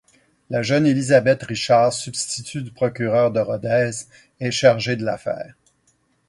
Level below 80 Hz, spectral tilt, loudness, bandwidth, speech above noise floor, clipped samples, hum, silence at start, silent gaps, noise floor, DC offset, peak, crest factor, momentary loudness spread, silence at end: -58 dBFS; -5 dB/octave; -20 LUFS; 11.5 kHz; 44 dB; under 0.1%; none; 0.5 s; none; -64 dBFS; under 0.1%; -2 dBFS; 20 dB; 12 LU; 0.8 s